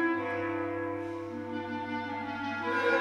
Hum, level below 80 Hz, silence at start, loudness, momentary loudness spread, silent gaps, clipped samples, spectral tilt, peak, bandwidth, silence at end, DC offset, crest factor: none; -68 dBFS; 0 s; -34 LUFS; 8 LU; none; under 0.1%; -6 dB/octave; -16 dBFS; 11 kHz; 0 s; under 0.1%; 18 dB